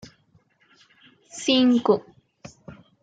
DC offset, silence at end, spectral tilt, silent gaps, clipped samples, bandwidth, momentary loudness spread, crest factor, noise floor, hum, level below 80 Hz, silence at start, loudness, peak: under 0.1%; 0.3 s; -4 dB/octave; none; under 0.1%; 9.2 kHz; 25 LU; 20 dB; -62 dBFS; none; -68 dBFS; 1.35 s; -21 LUFS; -6 dBFS